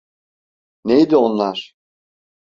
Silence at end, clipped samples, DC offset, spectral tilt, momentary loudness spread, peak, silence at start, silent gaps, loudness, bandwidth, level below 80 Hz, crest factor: 0.8 s; under 0.1%; under 0.1%; -7 dB/octave; 16 LU; -2 dBFS; 0.85 s; none; -16 LUFS; 7.2 kHz; -60 dBFS; 18 dB